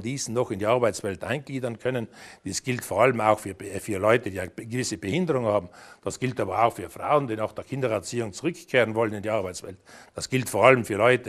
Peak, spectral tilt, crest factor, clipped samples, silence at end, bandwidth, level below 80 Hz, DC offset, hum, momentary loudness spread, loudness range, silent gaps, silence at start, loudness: -2 dBFS; -5 dB/octave; 24 dB; under 0.1%; 0 s; 13.5 kHz; -62 dBFS; under 0.1%; none; 14 LU; 2 LU; none; 0 s; -26 LUFS